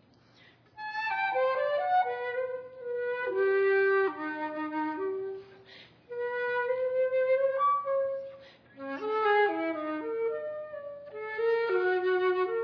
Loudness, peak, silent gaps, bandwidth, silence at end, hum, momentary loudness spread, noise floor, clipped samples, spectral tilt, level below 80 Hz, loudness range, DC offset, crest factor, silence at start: -30 LUFS; -18 dBFS; none; 5.4 kHz; 0 s; none; 14 LU; -60 dBFS; under 0.1%; -6 dB/octave; -78 dBFS; 3 LU; under 0.1%; 12 dB; 0.75 s